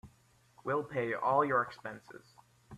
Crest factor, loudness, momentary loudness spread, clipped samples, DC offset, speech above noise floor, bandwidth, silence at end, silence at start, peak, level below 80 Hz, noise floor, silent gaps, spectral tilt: 20 dB; -33 LUFS; 18 LU; under 0.1%; under 0.1%; 33 dB; 13.5 kHz; 0 s; 0.05 s; -16 dBFS; -72 dBFS; -67 dBFS; none; -7 dB/octave